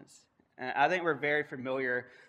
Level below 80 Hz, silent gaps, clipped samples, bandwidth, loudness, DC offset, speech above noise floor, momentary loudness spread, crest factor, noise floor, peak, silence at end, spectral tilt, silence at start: -82 dBFS; none; under 0.1%; 10.5 kHz; -31 LUFS; under 0.1%; 31 dB; 8 LU; 22 dB; -63 dBFS; -12 dBFS; 0.2 s; -5.5 dB/octave; 0.6 s